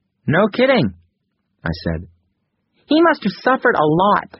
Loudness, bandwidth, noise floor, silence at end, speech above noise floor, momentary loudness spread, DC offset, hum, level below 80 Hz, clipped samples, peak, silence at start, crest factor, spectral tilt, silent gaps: -17 LUFS; 6 kHz; -71 dBFS; 0.15 s; 55 dB; 12 LU; under 0.1%; none; -44 dBFS; under 0.1%; -2 dBFS; 0.25 s; 16 dB; -4.5 dB/octave; none